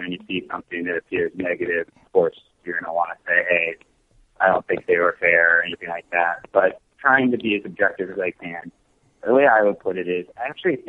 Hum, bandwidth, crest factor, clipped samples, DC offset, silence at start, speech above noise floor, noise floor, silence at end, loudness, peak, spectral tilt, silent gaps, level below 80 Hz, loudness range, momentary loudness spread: none; 4.1 kHz; 20 dB; under 0.1%; under 0.1%; 0 s; 38 dB; -59 dBFS; 0.05 s; -21 LUFS; -2 dBFS; -7.5 dB/octave; none; -62 dBFS; 4 LU; 12 LU